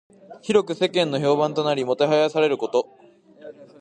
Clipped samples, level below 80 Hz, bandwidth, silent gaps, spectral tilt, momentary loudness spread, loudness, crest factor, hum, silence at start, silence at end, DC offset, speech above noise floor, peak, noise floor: under 0.1%; -70 dBFS; 9.8 kHz; none; -5.5 dB/octave; 6 LU; -21 LUFS; 18 dB; none; 0.3 s; 0.15 s; under 0.1%; 23 dB; -6 dBFS; -44 dBFS